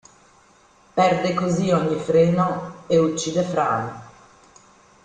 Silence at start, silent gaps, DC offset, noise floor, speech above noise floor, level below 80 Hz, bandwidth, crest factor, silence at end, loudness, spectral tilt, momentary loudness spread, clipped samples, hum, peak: 0.95 s; none; under 0.1%; -55 dBFS; 35 dB; -56 dBFS; 9.4 kHz; 16 dB; 0.95 s; -21 LUFS; -6 dB/octave; 9 LU; under 0.1%; none; -6 dBFS